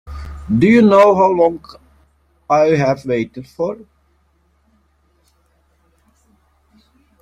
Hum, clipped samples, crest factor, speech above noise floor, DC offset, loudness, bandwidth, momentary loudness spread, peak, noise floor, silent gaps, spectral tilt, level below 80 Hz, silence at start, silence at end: none; under 0.1%; 16 dB; 46 dB; under 0.1%; -14 LUFS; 9.8 kHz; 22 LU; 0 dBFS; -59 dBFS; none; -7.5 dB/octave; -42 dBFS; 0.05 s; 3.45 s